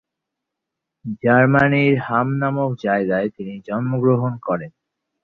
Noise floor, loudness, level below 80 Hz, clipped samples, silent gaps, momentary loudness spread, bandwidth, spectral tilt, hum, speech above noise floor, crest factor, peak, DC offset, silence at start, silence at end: -82 dBFS; -19 LUFS; -56 dBFS; under 0.1%; none; 13 LU; 6 kHz; -9.5 dB/octave; none; 64 dB; 18 dB; -2 dBFS; under 0.1%; 1.05 s; 0.55 s